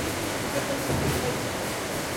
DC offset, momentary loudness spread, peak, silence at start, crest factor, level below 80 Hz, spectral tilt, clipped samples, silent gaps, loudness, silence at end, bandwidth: under 0.1%; 3 LU; -14 dBFS; 0 s; 14 dB; -46 dBFS; -4 dB/octave; under 0.1%; none; -28 LUFS; 0 s; 16.5 kHz